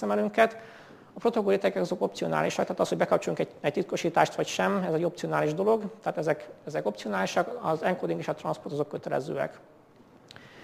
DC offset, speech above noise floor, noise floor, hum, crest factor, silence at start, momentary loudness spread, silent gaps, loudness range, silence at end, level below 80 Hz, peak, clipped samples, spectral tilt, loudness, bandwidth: under 0.1%; 28 dB; -56 dBFS; none; 22 dB; 0 s; 8 LU; none; 3 LU; 0 s; -70 dBFS; -6 dBFS; under 0.1%; -5.5 dB/octave; -29 LUFS; 15.5 kHz